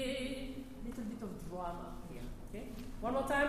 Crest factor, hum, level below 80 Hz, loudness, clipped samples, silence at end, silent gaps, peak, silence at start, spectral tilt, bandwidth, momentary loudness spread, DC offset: 18 dB; none; -50 dBFS; -43 LUFS; under 0.1%; 0 s; none; -20 dBFS; 0 s; -5 dB/octave; 15.5 kHz; 10 LU; under 0.1%